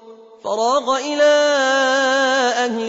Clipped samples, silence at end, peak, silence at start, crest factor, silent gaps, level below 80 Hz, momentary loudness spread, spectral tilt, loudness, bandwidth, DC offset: under 0.1%; 0 s; -6 dBFS; 0.05 s; 12 dB; none; -70 dBFS; 6 LU; -1.5 dB/octave; -16 LUFS; 8 kHz; under 0.1%